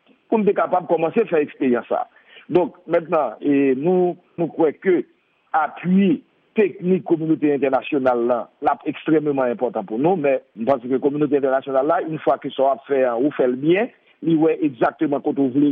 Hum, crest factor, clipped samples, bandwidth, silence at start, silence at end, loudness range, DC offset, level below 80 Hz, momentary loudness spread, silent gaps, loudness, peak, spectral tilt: none; 14 dB; under 0.1%; 4.2 kHz; 0.3 s; 0 s; 1 LU; under 0.1%; -68 dBFS; 5 LU; none; -20 LUFS; -6 dBFS; -10.5 dB/octave